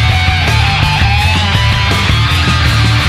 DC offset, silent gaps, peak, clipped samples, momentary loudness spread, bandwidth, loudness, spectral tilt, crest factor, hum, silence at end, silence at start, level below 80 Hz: under 0.1%; none; 0 dBFS; under 0.1%; 1 LU; 15 kHz; -10 LUFS; -4.5 dB/octave; 10 dB; none; 0 s; 0 s; -18 dBFS